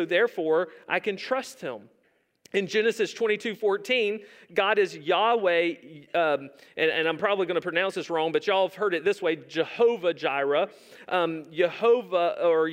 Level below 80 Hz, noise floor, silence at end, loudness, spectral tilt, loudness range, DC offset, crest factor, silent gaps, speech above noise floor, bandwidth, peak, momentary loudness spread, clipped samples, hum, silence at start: -82 dBFS; -61 dBFS; 0 s; -26 LUFS; -4.5 dB/octave; 3 LU; under 0.1%; 18 dB; none; 35 dB; 15.5 kHz; -8 dBFS; 7 LU; under 0.1%; none; 0 s